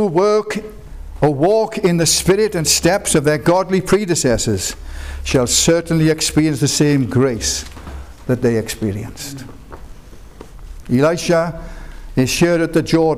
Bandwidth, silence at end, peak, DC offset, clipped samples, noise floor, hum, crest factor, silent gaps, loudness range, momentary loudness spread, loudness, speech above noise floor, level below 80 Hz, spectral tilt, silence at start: 16 kHz; 0 s; -4 dBFS; 0.5%; under 0.1%; -37 dBFS; none; 12 dB; none; 7 LU; 18 LU; -16 LUFS; 21 dB; -34 dBFS; -4.5 dB/octave; 0 s